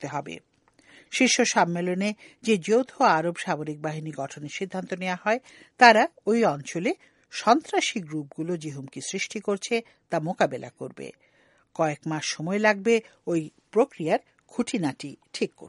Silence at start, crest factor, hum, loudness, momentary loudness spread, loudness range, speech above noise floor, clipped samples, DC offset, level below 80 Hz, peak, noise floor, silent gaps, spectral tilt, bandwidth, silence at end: 0 s; 26 dB; none; -25 LUFS; 15 LU; 7 LU; 30 dB; under 0.1%; under 0.1%; -74 dBFS; 0 dBFS; -56 dBFS; none; -4 dB/octave; 11.5 kHz; 0 s